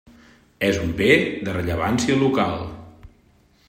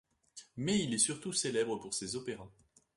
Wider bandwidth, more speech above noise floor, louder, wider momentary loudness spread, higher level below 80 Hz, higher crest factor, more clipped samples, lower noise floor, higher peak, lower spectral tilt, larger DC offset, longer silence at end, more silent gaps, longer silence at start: first, 16 kHz vs 11.5 kHz; first, 37 dB vs 23 dB; first, -21 LUFS vs -34 LUFS; second, 12 LU vs 18 LU; first, -46 dBFS vs -68 dBFS; about the same, 20 dB vs 20 dB; neither; about the same, -57 dBFS vs -58 dBFS; first, -2 dBFS vs -16 dBFS; first, -5.5 dB/octave vs -3 dB/octave; neither; first, 0.6 s vs 0.45 s; neither; first, 0.6 s vs 0.35 s